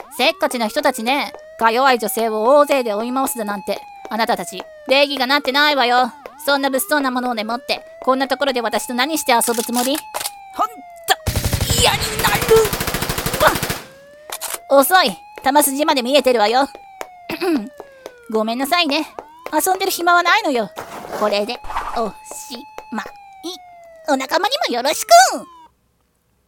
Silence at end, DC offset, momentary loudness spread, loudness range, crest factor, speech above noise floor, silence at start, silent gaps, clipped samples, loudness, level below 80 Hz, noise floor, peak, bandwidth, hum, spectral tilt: 1 s; under 0.1%; 16 LU; 5 LU; 18 dB; 46 dB; 0 s; none; under 0.1%; -17 LUFS; -40 dBFS; -63 dBFS; 0 dBFS; 18 kHz; none; -3 dB/octave